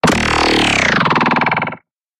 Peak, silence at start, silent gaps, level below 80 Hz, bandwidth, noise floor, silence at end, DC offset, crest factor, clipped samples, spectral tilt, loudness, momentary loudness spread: -2 dBFS; 0.05 s; none; -36 dBFS; 15.5 kHz; -35 dBFS; 0.45 s; under 0.1%; 14 dB; under 0.1%; -4 dB/octave; -13 LUFS; 6 LU